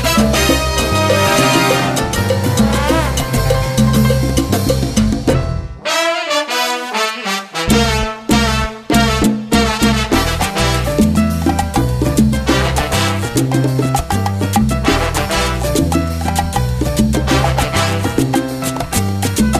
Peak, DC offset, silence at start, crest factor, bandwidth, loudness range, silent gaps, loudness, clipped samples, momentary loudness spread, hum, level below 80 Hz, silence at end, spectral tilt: 0 dBFS; under 0.1%; 0 s; 14 dB; 14 kHz; 2 LU; none; -15 LUFS; under 0.1%; 5 LU; none; -24 dBFS; 0 s; -4.5 dB/octave